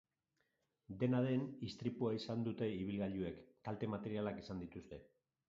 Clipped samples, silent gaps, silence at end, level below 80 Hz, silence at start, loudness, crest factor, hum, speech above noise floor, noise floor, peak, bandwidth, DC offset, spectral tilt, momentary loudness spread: under 0.1%; none; 0.45 s; -68 dBFS; 0.9 s; -42 LUFS; 18 dB; none; 44 dB; -85 dBFS; -24 dBFS; 7.4 kHz; under 0.1%; -7 dB/octave; 14 LU